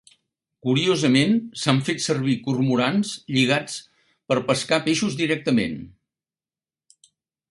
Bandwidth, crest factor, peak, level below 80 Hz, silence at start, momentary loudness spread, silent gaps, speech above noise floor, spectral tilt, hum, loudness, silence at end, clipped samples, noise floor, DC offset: 11.5 kHz; 22 dB; -2 dBFS; -60 dBFS; 0.65 s; 7 LU; none; over 69 dB; -5 dB/octave; none; -22 LUFS; 1.6 s; under 0.1%; under -90 dBFS; under 0.1%